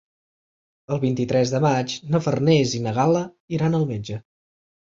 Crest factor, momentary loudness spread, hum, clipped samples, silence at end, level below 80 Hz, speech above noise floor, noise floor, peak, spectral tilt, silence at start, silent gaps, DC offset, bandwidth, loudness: 18 dB; 10 LU; none; under 0.1%; 0.75 s; -56 dBFS; over 69 dB; under -90 dBFS; -6 dBFS; -6.5 dB/octave; 0.9 s; 3.40-3.48 s; under 0.1%; 7.6 kHz; -22 LUFS